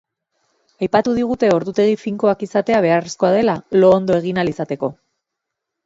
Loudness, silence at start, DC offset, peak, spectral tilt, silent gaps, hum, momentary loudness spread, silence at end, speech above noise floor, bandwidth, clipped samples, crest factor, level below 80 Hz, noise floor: -17 LUFS; 0.8 s; under 0.1%; 0 dBFS; -6.5 dB/octave; none; none; 9 LU; 0.95 s; 64 dB; 8 kHz; under 0.1%; 18 dB; -54 dBFS; -80 dBFS